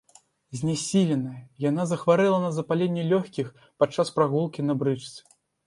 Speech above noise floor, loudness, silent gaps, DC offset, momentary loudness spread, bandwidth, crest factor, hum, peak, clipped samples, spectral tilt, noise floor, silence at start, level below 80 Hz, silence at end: 33 dB; -25 LUFS; none; under 0.1%; 12 LU; 11.5 kHz; 18 dB; none; -6 dBFS; under 0.1%; -6 dB/octave; -58 dBFS; 0.5 s; -66 dBFS; 0.5 s